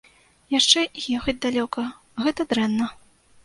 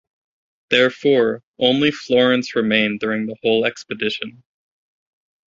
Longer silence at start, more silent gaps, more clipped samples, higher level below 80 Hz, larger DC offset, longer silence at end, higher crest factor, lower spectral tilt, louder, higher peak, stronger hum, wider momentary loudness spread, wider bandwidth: second, 0.5 s vs 0.7 s; second, none vs 1.43-1.54 s; neither; first, -52 dBFS vs -60 dBFS; neither; second, 0.5 s vs 1.2 s; first, 24 dB vs 18 dB; second, -2.5 dB/octave vs -5 dB/octave; second, -22 LUFS vs -18 LUFS; about the same, 0 dBFS vs -2 dBFS; neither; first, 12 LU vs 8 LU; first, 11.5 kHz vs 7.6 kHz